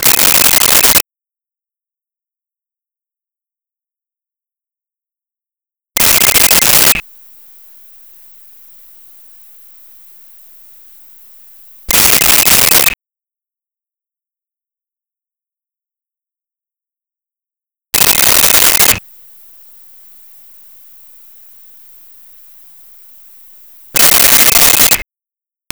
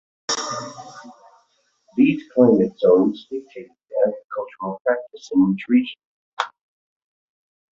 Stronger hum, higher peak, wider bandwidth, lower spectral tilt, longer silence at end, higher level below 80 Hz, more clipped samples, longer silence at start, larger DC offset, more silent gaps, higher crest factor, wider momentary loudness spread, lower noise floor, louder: neither; about the same, 0 dBFS vs -2 dBFS; first, over 20 kHz vs 7.8 kHz; second, 0 dB/octave vs -5.5 dB/octave; second, 0.7 s vs 1.25 s; first, -40 dBFS vs -64 dBFS; neither; second, 0 s vs 0.3 s; neither; second, none vs 4.24-4.30 s, 4.81-4.85 s, 6.05-6.37 s; second, 14 dB vs 20 dB; second, 10 LU vs 17 LU; first, -89 dBFS vs -64 dBFS; first, -6 LUFS vs -21 LUFS